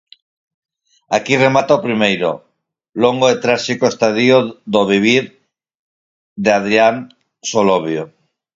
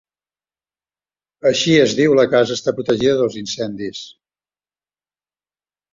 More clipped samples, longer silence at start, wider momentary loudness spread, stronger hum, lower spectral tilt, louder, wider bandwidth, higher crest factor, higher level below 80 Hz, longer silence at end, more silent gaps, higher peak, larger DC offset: neither; second, 1.1 s vs 1.45 s; about the same, 12 LU vs 12 LU; second, none vs 50 Hz at -50 dBFS; about the same, -4.5 dB/octave vs -4.5 dB/octave; about the same, -15 LUFS vs -16 LUFS; about the same, 7.8 kHz vs 7.6 kHz; about the same, 16 dB vs 18 dB; about the same, -58 dBFS vs -56 dBFS; second, 0.5 s vs 1.85 s; first, 5.75-6.36 s vs none; about the same, 0 dBFS vs -2 dBFS; neither